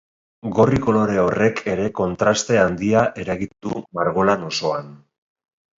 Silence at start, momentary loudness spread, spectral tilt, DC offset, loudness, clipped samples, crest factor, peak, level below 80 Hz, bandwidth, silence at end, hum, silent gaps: 0.45 s; 10 LU; -5.5 dB/octave; under 0.1%; -20 LUFS; under 0.1%; 18 dB; -2 dBFS; -46 dBFS; 7.8 kHz; 0.8 s; none; none